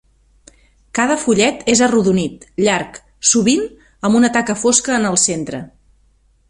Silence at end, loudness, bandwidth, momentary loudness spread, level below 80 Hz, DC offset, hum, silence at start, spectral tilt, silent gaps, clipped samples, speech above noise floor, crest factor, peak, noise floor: 0.8 s; -15 LUFS; 11.5 kHz; 11 LU; -50 dBFS; under 0.1%; none; 0.95 s; -3.5 dB/octave; none; under 0.1%; 40 dB; 18 dB; 0 dBFS; -55 dBFS